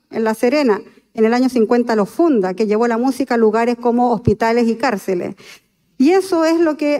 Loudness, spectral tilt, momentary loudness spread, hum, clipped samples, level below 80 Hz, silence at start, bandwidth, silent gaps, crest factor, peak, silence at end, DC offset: -16 LUFS; -6 dB/octave; 6 LU; none; under 0.1%; -50 dBFS; 0.1 s; 15.5 kHz; none; 14 dB; -2 dBFS; 0 s; under 0.1%